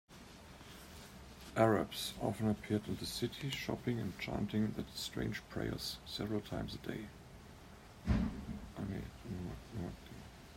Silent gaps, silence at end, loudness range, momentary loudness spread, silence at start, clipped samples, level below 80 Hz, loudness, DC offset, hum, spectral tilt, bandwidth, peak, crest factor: none; 0 s; 6 LU; 18 LU; 0.1 s; under 0.1%; -52 dBFS; -40 LUFS; under 0.1%; none; -5.5 dB/octave; 16 kHz; -16 dBFS; 24 dB